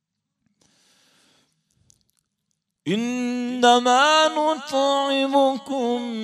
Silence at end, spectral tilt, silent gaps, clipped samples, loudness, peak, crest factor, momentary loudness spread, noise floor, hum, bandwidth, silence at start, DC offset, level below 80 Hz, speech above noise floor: 0 s; -3 dB/octave; none; under 0.1%; -20 LUFS; -4 dBFS; 20 dB; 10 LU; -77 dBFS; none; 14.5 kHz; 2.85 s; under 0.1%; -80 dBFS; 57 dB